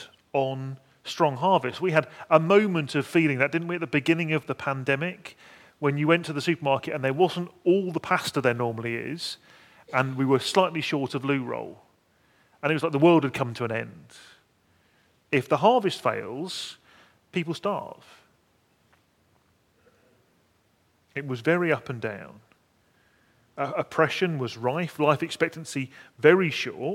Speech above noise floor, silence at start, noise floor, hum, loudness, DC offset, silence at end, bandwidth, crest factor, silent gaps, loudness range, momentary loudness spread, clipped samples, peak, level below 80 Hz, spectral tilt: 41 dB; 0 s; -66 dBFS; none; -25 LUFS; under 0.1%; 0 s; 16 kHz; 24 dB; none; 9 LU; 13 LU; under 0.1%; -2 dBFS; -72 dBFS; -6 dB/octave